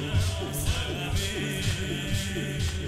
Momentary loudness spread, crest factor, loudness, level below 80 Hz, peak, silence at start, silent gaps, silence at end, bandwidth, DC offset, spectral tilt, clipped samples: 2 LU; 14 dB; -29 LUFS; -36 dBFS; -14 dBFS; 0 s; none; 0 s; 16 kHz; 0.1%; -4.5 dB/octave; under 0.1%